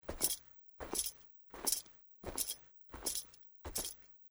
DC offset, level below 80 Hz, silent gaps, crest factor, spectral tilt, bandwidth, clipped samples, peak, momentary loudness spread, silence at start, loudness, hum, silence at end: under 0.1%; -60 dBFS; none; 28 dB; -1 dB/octave; over 20 kHz; under 0.1%; -16 dBFS; 18 LU; 0.05 s; -39 LUFS; none; 0 s